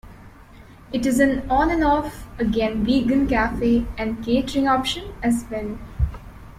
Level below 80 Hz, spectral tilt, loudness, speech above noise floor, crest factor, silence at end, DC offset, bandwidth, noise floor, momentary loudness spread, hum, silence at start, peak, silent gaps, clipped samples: -34 dBFS; -5.5 dB/octave; -21 LUFS; 24 dB; 16 dB; 0.05 s; under 0.1%; 15.5 kHz; -45 dBFS; 10 LU; none; 0.05 s; -6 dBFS; none; under 0.1%